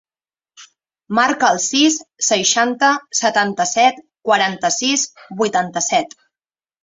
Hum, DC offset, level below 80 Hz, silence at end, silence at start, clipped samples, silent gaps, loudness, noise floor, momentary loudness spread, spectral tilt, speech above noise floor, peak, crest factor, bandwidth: none; under 0.1%; -64 dBFS; 0.75 s; 0.6 s; under 0.1%; none; -16 LUFS; under -90 dBFS; 6 LU; -1.5 dB/octave; over 73 dB; -2 dBFS; 18 dB; 8.2 kHz